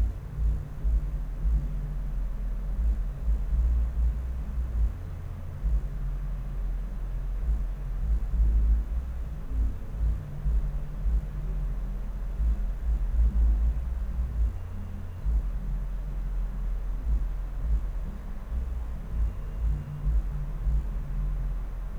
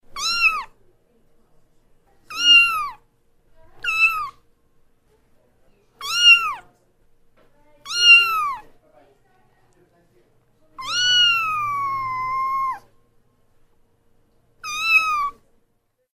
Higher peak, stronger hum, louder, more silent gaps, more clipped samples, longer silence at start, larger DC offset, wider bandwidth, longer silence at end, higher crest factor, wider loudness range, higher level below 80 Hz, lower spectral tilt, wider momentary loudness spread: second, -14 dBFS vs -2 dBFS; neither; second, -32 LUFS vs -16 LUFS; neither; neither; second, 0 s vs 0.15 s; neither; second, 3 kHz vs 15.5 kHz; second, 0 s vs 0.85 s; second, 12 dB vs 20 dB; second, 4 LU vs 8 LU; first, -28 dBFS vs -54 dBFS; first, -8.5 dB/octave vs 2 dB/octave; second, 8 LU vs 21 LU